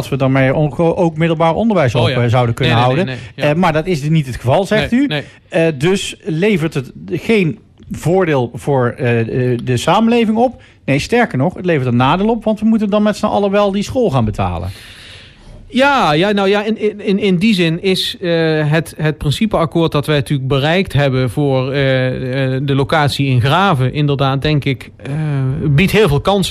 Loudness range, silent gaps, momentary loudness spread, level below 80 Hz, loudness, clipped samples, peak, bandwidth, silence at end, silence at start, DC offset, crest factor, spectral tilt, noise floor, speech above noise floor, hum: 2 LU; none; 7 LU; -38 dBFS; -14 LUFS; under 0.1%; -2 dBFS; 14.5 kHz; 0 s; 0 s; under 0.1%; 12 dB; -6.5 dB/octave; -37 dBFS; 23 dB; none